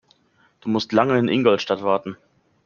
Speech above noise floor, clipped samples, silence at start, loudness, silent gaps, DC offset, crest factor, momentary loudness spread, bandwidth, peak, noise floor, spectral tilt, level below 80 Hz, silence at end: 41 dB; under 0.1%; 0.65 s; -20 LUFS; none; under 0.1%; 20 dB; 10 LU; 7 kHz; -2 dBFS; -61 dBFS; -6.5 dB/octave; -64 dBFS; 0.5 s